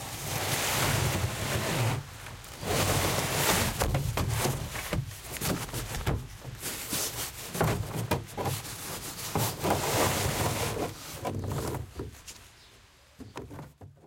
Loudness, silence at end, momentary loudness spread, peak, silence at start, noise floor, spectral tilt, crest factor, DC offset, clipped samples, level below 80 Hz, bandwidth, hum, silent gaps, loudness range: -30 LUFS; 0 s; 16 LU; -12 dBFS; 0 s; -57 dBFS; -3.5 dB/octave; 20 dB; under 0.1%; under 0.1%; -46 dBFS; 16.5 kHz; none; none; 5 LU